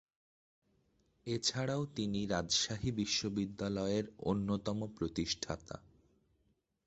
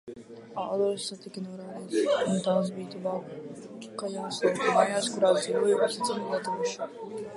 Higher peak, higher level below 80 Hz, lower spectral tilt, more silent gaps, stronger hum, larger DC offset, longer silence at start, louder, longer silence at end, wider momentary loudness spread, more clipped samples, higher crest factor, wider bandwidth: second, -20 dBFS vs -8 dBFS; first, -60 dBFS vs -76 dBFS; about the same, -4 dB/octave vs -4.5 dB/octave; neither; neither; neither; first, 1.25 s vs 0.05 s; second, -36 LUFS vs -28 LUFS; first, 1.05 s vs 0 s; second, 9 LU vs 16 LU; neither; about the same, 20 dB vs 22 dB; second, 8.2 kHz vs 11.5 kHz